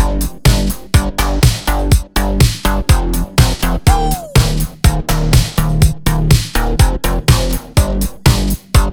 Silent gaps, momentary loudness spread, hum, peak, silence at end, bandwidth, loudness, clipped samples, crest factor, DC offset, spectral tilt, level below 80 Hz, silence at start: none; 4 LU; none; 0 dBFS; 0 s; over 20 kHz; -14 LUFS; under 0.1%; 12 dB; 0.9%; -5 dB/octave; -16 dBFS; 0 s